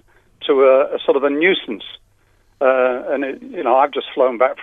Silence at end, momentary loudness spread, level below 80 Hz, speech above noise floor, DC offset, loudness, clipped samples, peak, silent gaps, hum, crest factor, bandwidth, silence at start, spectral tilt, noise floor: 0 s; 13 LU; -60 dBFS; 40 dB; under 0.1%; -17 LUFS; under 0.1%; 0 dBFS; none; none; 16 dB; 3.9 kHz; 0.4 s; -6.5 dB/octave; -56 dBFS